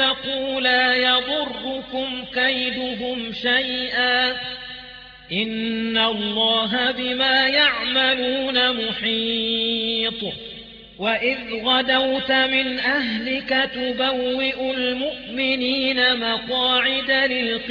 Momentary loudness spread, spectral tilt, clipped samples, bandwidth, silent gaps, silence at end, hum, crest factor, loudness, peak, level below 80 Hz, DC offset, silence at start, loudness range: 10 LU; -5 dB/octave; under 0.1%; 5.4 kHz; none; 0 s; none; 16 dB; -20 LUFS; -4 dBFS; -54 dBFS; under 0.1%; 0 s; 3 LU